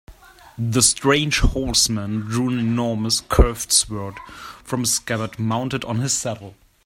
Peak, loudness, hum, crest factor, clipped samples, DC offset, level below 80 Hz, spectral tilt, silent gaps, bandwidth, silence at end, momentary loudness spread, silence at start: 0 dBFS; -20 LUFS; none; 20 dB; under 0.1%; under 0.1%; -28 dBFS; -3.5 dB/octave; none; 16 kHz; 0.3 s; 13 LU; 0.1 s